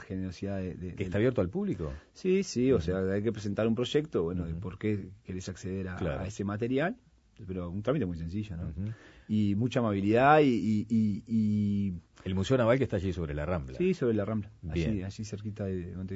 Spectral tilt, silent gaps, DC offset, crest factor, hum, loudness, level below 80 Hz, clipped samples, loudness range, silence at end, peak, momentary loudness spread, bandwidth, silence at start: -7 dB/octave; none; under 0.1%; 22 dB; none; -31 LUFS; -50 dBFS; under 0.1%; 7 LU; 0 s; -8 dBFS; 12 LU; 8 kHz; 0 s